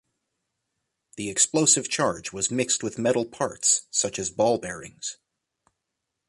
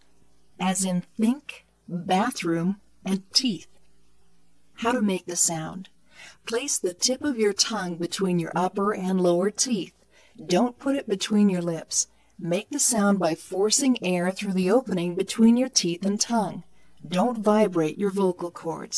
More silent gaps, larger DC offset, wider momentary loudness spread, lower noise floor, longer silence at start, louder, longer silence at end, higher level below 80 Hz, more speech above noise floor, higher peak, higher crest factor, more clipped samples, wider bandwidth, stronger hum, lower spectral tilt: neither; neither; first, 15 LU vs 11 LU; first, -82 dBFS vs -65 dBFS; first, 1.15 s vs 0.6 s; about the same, -23 LUFS vs -24 LUFS; first, 1.15 s vs 0 s; about the same, -62 dBFS vs -66 dBFS; first, 57 dB vs 41 dB; about the same, -4 dBFS vs -6 dBFS; about the same, 22 dB vs 20 dB; neither; about the same, 11.5 kHz vs 11 kHz; neither; second, -2.5 dB/octave vs -4 dB/octave